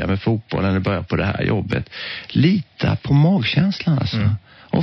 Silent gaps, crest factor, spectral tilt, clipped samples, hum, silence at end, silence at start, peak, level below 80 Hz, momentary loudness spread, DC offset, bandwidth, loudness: none; 16 dB; -6 dB/octave; under 0.1%; none; 0 s; 0 s; -4 dBFS; -42 dBFS; 8 LU; under 0.1%; 6.2 kHz; -20 LUFS